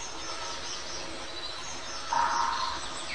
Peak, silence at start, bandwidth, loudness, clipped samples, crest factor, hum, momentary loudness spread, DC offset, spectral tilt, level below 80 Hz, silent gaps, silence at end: -14 dBFS; 0 s; 10 kHz; -32 LUFS; under 0.1%; 18 dB; none; 9 LU; 0.9%; -1 dB/octave; -54 dBFS; none; 0 s